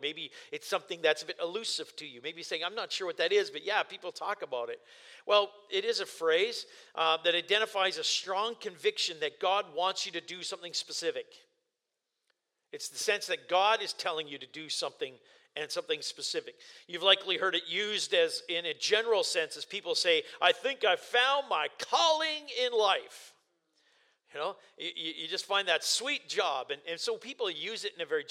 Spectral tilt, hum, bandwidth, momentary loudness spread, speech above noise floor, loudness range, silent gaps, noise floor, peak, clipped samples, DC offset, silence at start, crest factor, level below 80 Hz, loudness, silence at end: -0.5 dB/octave; none; 16 kHz; 14 LU; 54 dB; 6 LU; none; -86 dBFS; -10 dBFS; under 0.1%; under 0.1%; 0 s; 24 dB; under -90 dBFS; -31 LUFS; 0.05 s